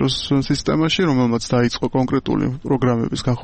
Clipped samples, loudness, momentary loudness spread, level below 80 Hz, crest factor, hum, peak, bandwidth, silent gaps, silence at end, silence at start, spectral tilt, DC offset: under 0.1%; -19 LUFS; 4 LU; -40 dBFS; 12 dB; none; -8 dBFS; 8.8 kHz; none; 0 s; 0 s; -6 dB/octave; under 0.1%